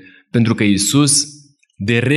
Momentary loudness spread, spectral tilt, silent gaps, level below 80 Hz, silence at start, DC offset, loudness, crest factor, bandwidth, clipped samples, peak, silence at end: 11 LU; -4 dB/octave; none; -52 dBFS; 0.35 s; under 0.1%; -15 LUFS; 14 dB; 15.5 kHz; under 0.1%; -2 dBFS; 0 s